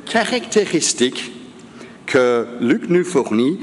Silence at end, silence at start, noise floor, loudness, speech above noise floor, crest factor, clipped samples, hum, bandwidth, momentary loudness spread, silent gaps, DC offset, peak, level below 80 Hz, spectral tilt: 0 s; 0 s; -39 dBFS; -18 LUFS; 22 dB; 16 dB; under 0.1%; none; 11.5 kHz; 13 LU; none; under 0.1%; -4 dBFS; -64 dBFS; -3.5 dB/octave